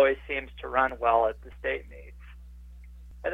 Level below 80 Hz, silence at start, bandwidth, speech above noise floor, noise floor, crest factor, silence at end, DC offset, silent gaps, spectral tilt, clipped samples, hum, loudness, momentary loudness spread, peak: -46 dBFS; 0 s; 5 kHz; 18 dB; -46 dBFS; 20 dB; 0 s; under 0.1%; none; -6.5 dB/octave; under 0.1%; 60 Hz at -50 dBFS; -28 LUFS; 25 LU; -10 dBFS